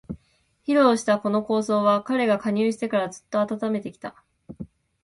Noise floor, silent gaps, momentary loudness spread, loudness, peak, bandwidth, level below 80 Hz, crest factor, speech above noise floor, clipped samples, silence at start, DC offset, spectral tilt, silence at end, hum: -65 dBFS; none; 21 LU; -23 LUFS; -6 dBFS; 11.5 kHz; -60 dBFS; 18 dB; 43 dB; under 0.1%; 0.1 s; under 0.1%; -5.5 dB/octave; 0.4 s; none